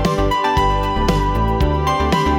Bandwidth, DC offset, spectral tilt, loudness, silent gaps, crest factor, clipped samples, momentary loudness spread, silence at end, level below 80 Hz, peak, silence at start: 17.5 kHz; under 0.1%; -6 dB/octave; -17 LUFS; none; 10 dB; under 0.1%; 2 LU; 0 s; -22 dBFS; -6 dBFS; 0 s